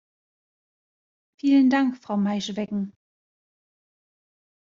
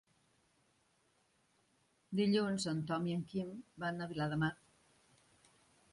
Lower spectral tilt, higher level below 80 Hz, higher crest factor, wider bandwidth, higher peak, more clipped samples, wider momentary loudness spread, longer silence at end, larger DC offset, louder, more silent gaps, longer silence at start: about the same, -5 dB/octave vs -6 dB/octave; about the same, -72 dBFS vs -72 dBFS; about the same, 18 dB vs 18 dB; second, 7.4 kHz vs 11.5 kHz; first, -10 dBFS vs -22 dBFS; neither; about the same, 12 LU vs 10 LU; first, 1.8 s vs 1.4 s; neither; first, -23 LUFS vs -38 LUFS; neither; second, 1.45 s vs 2.1 s